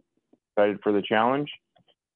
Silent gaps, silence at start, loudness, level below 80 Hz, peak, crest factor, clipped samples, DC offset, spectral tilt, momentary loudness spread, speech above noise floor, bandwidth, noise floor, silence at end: none; 0.55 s; -25 LUFS; -76 dBFS; -8 dBFS; 18 dB; under 0.1%; under 0.1%; -9 dB/octave; 12 LU; 43 dB; 4.2 kHz; -67 dBFS; 0.6 s